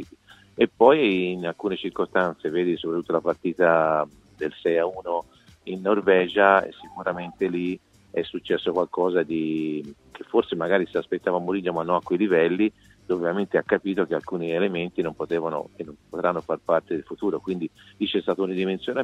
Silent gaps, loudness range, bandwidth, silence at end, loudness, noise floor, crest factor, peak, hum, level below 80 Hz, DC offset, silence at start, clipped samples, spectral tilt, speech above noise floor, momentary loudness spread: none; 4 LU; 8.6 kHz; 0 s; -24 LUFS; -52 dBFS; 22 dB; -2 dBFS; none; -62 dBFS; under 0.1%; 0 s; under 0.1%; -7.5 dB/octave; 28 dB; 12 LU